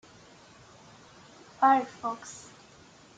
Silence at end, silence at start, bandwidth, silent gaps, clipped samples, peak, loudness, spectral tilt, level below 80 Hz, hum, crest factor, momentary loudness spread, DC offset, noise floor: 0.8 s; 1.6 s; 9.2 kHz; none; under 0.1%; -10 dBFS; -27 LUFS; -3.5 dB/octave; -72 dBFS; none; 22 dB; 23 LU; under 0.1%; -55 dBFS